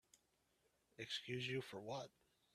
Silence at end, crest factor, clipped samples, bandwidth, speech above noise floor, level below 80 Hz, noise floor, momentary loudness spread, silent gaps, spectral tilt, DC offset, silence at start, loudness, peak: 0.45 s; 18 dB; under 0.1%; 14 kHz; 34 dB; -84 dBFS; -82 dBFS; 10 LU; none; -4.5 dB/octave; under 0.1%; 0.15 s; -48 LUFS; -32 dBFS